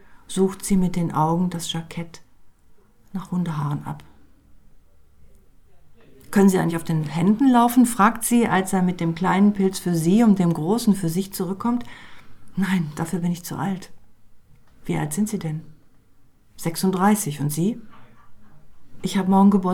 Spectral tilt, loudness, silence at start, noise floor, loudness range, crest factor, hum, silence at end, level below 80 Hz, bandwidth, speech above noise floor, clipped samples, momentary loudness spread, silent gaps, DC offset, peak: -6 dB/octave; -21 LUFS; 0.1 s; -51 dBFS; 12 LU; 18 dB; none; 0 s; -50 dBFS; 17.5 kHz; 31 dB; under 0.1%; 14 LU; none; under 0.1%; -4 dBFS